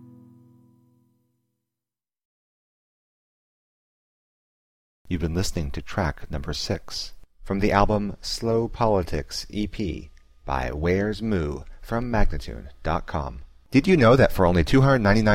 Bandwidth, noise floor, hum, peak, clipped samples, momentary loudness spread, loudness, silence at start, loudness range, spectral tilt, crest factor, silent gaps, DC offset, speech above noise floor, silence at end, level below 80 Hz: 16 kHz; under -90 dBFS; none; -4 dBFS; under 0.1%; 15 LU; -24 LUFS; 0 s; 10 LU; -6.5 dB/octave; 20 dB; 2.25-5.05 s; under 0.1%; over 68 dB; 0 s; -34 dBFS